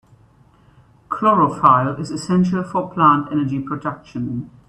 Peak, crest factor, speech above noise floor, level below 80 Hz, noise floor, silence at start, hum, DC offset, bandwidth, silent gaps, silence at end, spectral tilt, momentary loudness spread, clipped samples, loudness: 0 dBFS; 18 dB; 34 dB; -54 dBFS; -52 dBFS; 1.1 s; none; under 0.1%; 10.5 kHz; none; 0.2 s; -7.5 dB/octave; 13 LU; under 0.1%; -18 LUFS